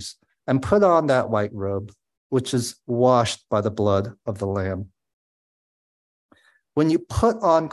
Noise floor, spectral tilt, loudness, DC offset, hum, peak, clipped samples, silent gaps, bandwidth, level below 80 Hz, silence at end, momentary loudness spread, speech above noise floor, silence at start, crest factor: under -90 dBFS; -6 dB/octave; -22 LUFS; under 0.1%; none; -4 dBFS; under 0.1%; 2.17-2.30 s, 5.13-6.29 s; 12.5 kHz; -44 dBFS; 0 s; 13 LU; over 69 dB; 0 s; 18 dB